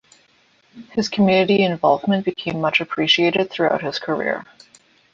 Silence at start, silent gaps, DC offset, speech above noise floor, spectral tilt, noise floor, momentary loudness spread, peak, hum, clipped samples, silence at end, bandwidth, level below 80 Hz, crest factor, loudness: 0.75 s; none; under 0.1%; 39 dB; -5.5 dB/octave; -58 dBFS; 9 LU; -4 dBFS; none; under 0.1%; 0.7 s; 7.6 kHz; -60 dBFS; 16 dB; -19 LUFS